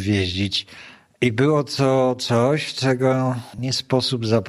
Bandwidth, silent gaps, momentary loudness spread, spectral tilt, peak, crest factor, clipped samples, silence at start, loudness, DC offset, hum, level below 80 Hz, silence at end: 14 kHz; none; 6 LU; -5.5 dB/octave; -4 dBFS; 18 dB; under 0.1%; 0 s; -21 LUFS; under 0.1%; none; -54 dBFS; 0 s